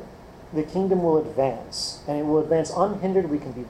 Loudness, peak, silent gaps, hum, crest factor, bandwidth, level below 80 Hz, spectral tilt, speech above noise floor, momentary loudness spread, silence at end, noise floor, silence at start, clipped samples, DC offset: -24 LUFS; -8 dBFS; none; none; 16 dB; 12.5 kHz; -52 dBFS; -6 dB/octave; 20 dB; 8 LU; 0 s; -43 dBFS; 0 s; under 0.1%; under 0.1%